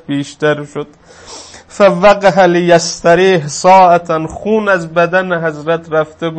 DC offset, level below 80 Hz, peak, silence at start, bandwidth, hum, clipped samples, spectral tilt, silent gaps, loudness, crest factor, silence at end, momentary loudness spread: under 0.1%; -46 dBFS; 0 dBFS; 0.1 s; 8.8 kHz; none; 0.3%; -5 dB/octave; none; -11 LUFS; 12 dB; 0 s; 18 LU